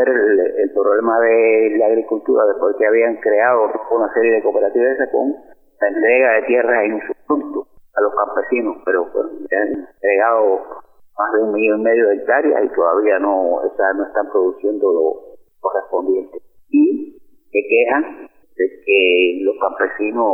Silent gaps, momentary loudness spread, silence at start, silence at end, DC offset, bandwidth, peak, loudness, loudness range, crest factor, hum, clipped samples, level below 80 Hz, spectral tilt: none; 9 LU; 0 s; 0 s; under 0.1%; 3.2 kHz; -2 dBFS; -16 LUFS; 4 LU; 14 dB; none; under 0.1%; -62 dBFS; -7.5 dB/octave